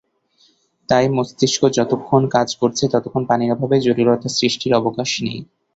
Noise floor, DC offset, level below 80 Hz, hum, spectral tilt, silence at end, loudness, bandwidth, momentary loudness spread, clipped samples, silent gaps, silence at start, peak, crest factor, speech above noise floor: -58 dBFS; under 0.1%; -54 dBFS; none; -5 dB/octave; 0.3 s; -18 LUFS; 8 kHz; 5 LU; under 0.1%; none; 0.9 s; -2 dBFS; 16 dB; 41 dB